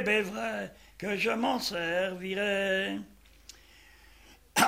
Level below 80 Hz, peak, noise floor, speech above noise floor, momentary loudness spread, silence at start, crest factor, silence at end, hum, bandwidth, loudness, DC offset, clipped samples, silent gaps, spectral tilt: -62 dBFS; -10 dBFS; -57 dBFS; 26 dB; 20 LU; 0 s; 22 dB; 0 s; none; 16 kHz; -31 LUFS; under 0.1%; under 0.1%; none; -3 dB/octave